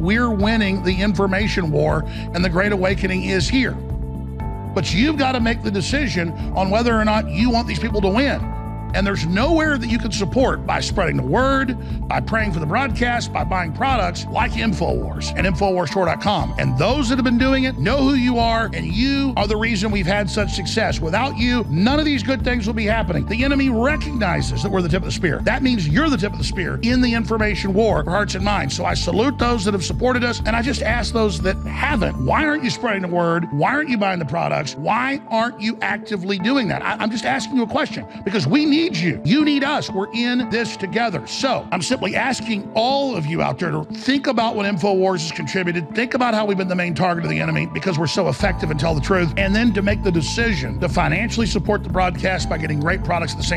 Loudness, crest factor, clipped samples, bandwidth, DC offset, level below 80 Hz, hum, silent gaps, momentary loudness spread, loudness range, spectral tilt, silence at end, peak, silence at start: -19 LUFS; 16 dB; under 0.1%; 13 kHz; under 0.1%; -30 dBFS; none; none; 5 LU; 2 LU; -5.5 dB/octave; 0 s; -2 dBFS; 0 s